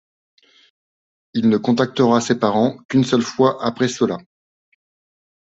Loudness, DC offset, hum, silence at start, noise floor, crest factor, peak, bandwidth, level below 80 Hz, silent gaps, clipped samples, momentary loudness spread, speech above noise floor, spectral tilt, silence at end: -18 LUFS; under 0.1%; none; 1.35 s; under -90 dBFS; 18 dB; -2 dBFS; 8 kHz; -60 dBFS; 2.85-2.89 s; under 0.1%; 5 LU; over 73 dB; -5.5 dB/octave; 1.2 s